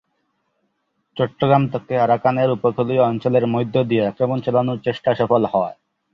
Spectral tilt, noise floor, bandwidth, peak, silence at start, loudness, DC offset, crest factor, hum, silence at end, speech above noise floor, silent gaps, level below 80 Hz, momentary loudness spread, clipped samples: -9.5 dB/octave; -70 dBFS; 6 kHz; -2 dBFS; 1.15 s; -19 LUFS; under 0.1%; 18 dB; none; 0.4 s; 52 dB; none; -58 dBFS; 6 LU; under 0.1%